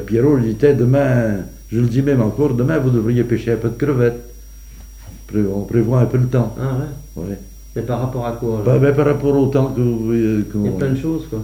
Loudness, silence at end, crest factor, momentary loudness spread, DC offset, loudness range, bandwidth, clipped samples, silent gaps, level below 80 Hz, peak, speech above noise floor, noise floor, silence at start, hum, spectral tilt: -17 LUFS; 0 s; 16 dB; 10 LU; under 0.1%; 4 LU; 16 kHz; under 0.1%; none; -36 dBFS; -2 dBFS; 20 dB; -36 dBFS; 0 s; none; -9 dB/octave